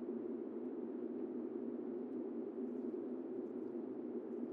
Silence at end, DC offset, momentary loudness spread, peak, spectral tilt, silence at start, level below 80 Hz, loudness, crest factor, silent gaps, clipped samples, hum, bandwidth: 0 s; under 0.1%; 1 LU; -32 dBFS; -9 dB/octave; 0 s; under -90 dBFS; -45 LUFS; 12 dB; none; under 0.1%; none; 3.7 kHz